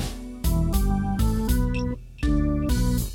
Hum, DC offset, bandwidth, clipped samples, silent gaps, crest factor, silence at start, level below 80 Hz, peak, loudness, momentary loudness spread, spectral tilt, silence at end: none; under 0.1%; 17 kHz; under 0.1%; none; 12 dB; 0 s; -26 dBFS; -10 dBFS; -25 LUFS; 6 LU; -6.5 dB/octave; 0 s